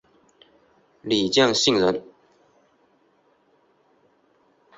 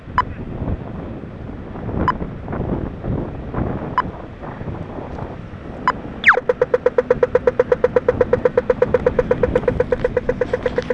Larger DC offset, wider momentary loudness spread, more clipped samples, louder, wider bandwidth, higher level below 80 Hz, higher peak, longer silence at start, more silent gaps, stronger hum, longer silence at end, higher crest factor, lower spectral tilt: neither; about the same, 13 LU vs 14 LU; neither; about the same, -20 LUFS vs -20 LUFS; first, 8.2 kHz vs 7.4 kHz; second, -62 dBFS vs -34 dBFS; second, -4 dBFS vs 0 dBFS; first, 1.05 s vs 0 s; neither; neither; first, 2.75 s vs 0 s; about the same, 22 dB vs 20 dB; second, -3.5 dB/octave vs -7.5 dB/octave